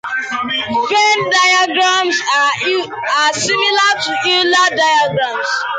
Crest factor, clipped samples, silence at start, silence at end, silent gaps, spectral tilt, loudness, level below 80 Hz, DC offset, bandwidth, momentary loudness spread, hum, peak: 12 dB; under 0.1%; 0.05 s; 0 s; none; -1.5 dB/octave; -13 LUFS; -58 dBFS; under 0.1%; 9.6 kHz; 7 LU; none; -2 dBFS